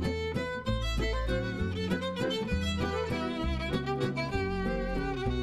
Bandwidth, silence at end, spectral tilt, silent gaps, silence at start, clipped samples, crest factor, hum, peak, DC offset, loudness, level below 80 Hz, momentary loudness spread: 13.5 kHz; 0 s; -6 dB/octave; none; 0 s; under 0.1%; 14 dB; none; -18 dBFS; under 0.1%; -32 LUFS; -38 dBFS; 2 LU